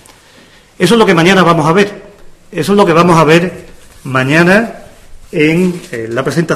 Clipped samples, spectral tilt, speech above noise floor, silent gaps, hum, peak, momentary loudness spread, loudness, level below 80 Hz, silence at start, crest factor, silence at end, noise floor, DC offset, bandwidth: 0.9%; -5.5 dB/octave; 32 dB; none; none; 0 dBFS; 13 LU; -10 LUFS; -42 dBFS; 0.8 s; 10 dB; 0 s; -42 dBFS; under 0.1%; 15 kHz